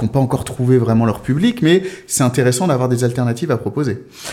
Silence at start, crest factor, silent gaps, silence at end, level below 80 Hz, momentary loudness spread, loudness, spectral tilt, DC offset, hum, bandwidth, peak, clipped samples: 0 s; 14 dB; none; 0 s; -44 dBFS; 7 LU; -16 LUFS; -6 dB/octave; under 0.1%; none; 16 kHz; -2 dBFS; under 0.1%